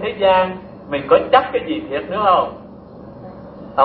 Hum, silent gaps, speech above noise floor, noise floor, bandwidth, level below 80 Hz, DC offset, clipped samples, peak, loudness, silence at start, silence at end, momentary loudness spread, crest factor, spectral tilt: none; none; 21 dB; -37 dBFS; 4.9 kHz; -48 dBFS; under 0.1%; under 0.1%; 0 dBFS; -17 LUFS; 0 s; 0 s; 23 LU; 18 dB; -8.5 dB/octave